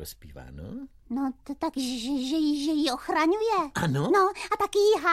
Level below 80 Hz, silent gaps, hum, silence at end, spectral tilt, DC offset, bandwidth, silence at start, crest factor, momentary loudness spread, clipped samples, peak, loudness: -54 dBFS; none; none; 0 s; -5 dB/octave; under 0.1%; 15 kHz; 0 s; 16 dB; 18 LU; under 0.1%; -10 dBFS; -26 LUFS